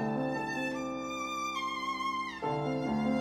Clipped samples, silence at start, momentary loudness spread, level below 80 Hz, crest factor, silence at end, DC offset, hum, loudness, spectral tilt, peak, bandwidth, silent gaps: under 0.1%; 0 s; 4 LU; -62 dBFS; 14 dB; 0 s; under 0.1%; none; -34 LUFS; -5 dB/octave; -20 dBFS; 15.5 kHz; none